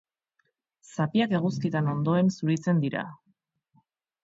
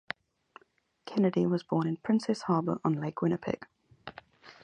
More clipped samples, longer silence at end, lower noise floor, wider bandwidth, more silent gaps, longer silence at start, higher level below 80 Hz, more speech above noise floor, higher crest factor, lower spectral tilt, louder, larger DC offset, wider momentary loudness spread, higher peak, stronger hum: neither; first, 1.1 s vs 0.1 s; first, -76 dBFS vs -69 dBFS; second, 7.8 kHz vs 9.8 kHz; neither; second, 0.9 s vs 1.05 s; about the same, -70 dBFS vs -70 dBFS; first, 50 dB vs 40 dB; about the same, 16 dB vs 18 dB; about the same, -7.5 dB/octave vs -7.5 dB/octave; first, -26 LUFS vs -30 LUFS; neither; second, 9 LU vs 20 LU; about the same, -12 dBFS vs -14 dBFS; neither